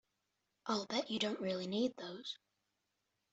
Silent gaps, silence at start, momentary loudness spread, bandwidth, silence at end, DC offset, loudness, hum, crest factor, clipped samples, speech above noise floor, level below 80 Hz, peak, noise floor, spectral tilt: none; 0.65 s; 10 LU; 8.2 kHz; 0.95 s; under 0.1%; -40 LUFS; none; 20 dB; under 0.1%; 47 dB; -82 dBFS; -22 dBFS; -86 dBFS; -4.5 dB/octave